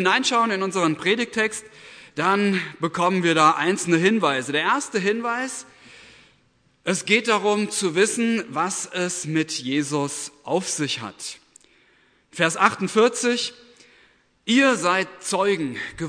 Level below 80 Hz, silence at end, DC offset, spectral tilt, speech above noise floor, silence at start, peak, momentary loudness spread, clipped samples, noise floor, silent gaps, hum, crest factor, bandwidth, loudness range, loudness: -66 dBFS; 0 s; under 0.1%; -3.5 dB/octave; 40 dB; 0 s; 0 dBFS; 11 LU; under 0.1%; -62 dBFS; none; none; 22 dB; 11 kHz; 5 LU; -22 LUFS